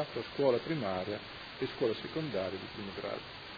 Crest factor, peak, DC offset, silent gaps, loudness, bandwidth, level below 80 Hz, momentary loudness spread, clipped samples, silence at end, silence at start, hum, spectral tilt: 20 dB; -16 dBFS; under 0.1%; none; -36 LUFS; 5 kHz; -64 dBFS; 10 LU; under 0.1%; 0 s; 0 s; none; -4 dB/octave